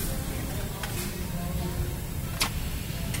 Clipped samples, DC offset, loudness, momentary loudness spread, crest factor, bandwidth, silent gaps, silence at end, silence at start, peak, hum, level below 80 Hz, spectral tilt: under 0.1%; under 0.1%; -32 LUFS; 5 LU; 22 dB; 16.5 kHz; none; 0 s; 0 s; -10 dBFS; none; -36 dBFS; -4 dB/octave